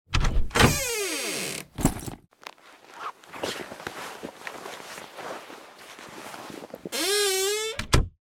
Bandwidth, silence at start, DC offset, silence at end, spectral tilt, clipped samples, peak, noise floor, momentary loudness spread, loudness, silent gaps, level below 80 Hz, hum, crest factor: 17.5 kHz; 0.1 s; under 0.1%; 0.15 s; -3.5 dB/octave; under 0.1%; -4 dBFS; -49 dBFS; 21 LU; -27 LUFS; none; -34 dBFS; none; 24 dB